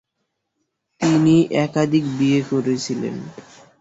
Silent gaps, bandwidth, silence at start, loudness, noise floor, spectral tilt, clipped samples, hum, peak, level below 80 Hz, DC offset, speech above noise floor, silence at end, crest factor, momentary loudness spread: none; 8 kHz; 1 s; -19 LUFS; -76 dBFS; -6.5 dB/octave; under 0.1%; none; -4 dBFS; -58 dBFS; under 0.1%; 57 dB; 0.4 s; 16 dB; 12 LU